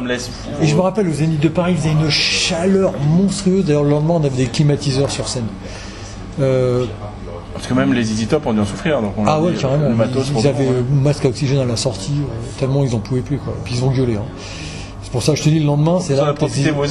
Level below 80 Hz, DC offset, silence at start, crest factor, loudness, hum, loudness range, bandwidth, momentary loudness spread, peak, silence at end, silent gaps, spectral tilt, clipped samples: -36 dBFS; under 0.1%; 0 s; 16 dB; -17 LUFS; none; 5 LU; 11.5 kHz; 12 LU; 0 dBFS; 0 s; none; -6 dB/octave; under 0.1%